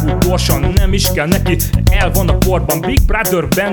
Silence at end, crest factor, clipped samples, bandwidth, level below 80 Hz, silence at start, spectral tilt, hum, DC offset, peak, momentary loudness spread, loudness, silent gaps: 0 s; 12 dB; under 0.1%; over 20 kHz; -16 dBFS; 0 s; -5 dB/octave; none; under 0.1%; 0 dBFS; 1 LU; -14 LUFS; none